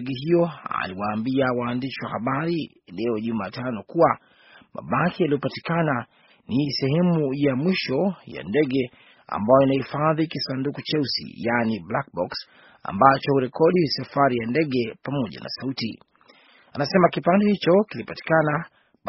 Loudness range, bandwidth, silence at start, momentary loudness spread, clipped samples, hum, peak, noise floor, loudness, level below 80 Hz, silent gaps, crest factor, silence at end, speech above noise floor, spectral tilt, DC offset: 4 LU; 6 kHz; 0 s; 11 LU; under 0.1%; none; 0 dBFS; -55 dBFS; -23 LUFS; -60 dBFS; none; 22 dB; 0 s; 32 dB; -5 dB/octave; under 0.1%